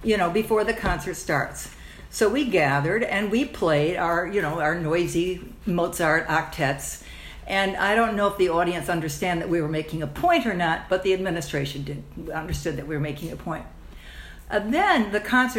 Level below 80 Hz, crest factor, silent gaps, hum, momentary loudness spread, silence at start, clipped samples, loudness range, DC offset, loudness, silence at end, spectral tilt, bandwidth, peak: -44 dBFS; 18 dB; none; none; 13 LU; 0 s; under 0.1%; 5 LU; under 0.1%; -24 LUFS; 0 s; -5 dB/octave; 16 kHz; -6 dBFS